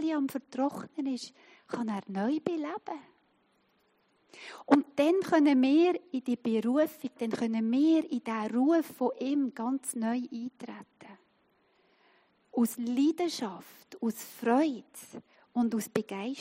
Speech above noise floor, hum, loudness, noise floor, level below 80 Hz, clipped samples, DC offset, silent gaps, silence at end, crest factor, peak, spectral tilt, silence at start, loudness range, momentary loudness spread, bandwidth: 41 dB; none; -30 LUFS; -71 dBFS; -84 dBFS; under 0.1%; under 0.1%; none; 0 s; 24 dB; -6 dBFS; -5 dB/octave; 0 s; 9 LU; 18 LU; 16 kHz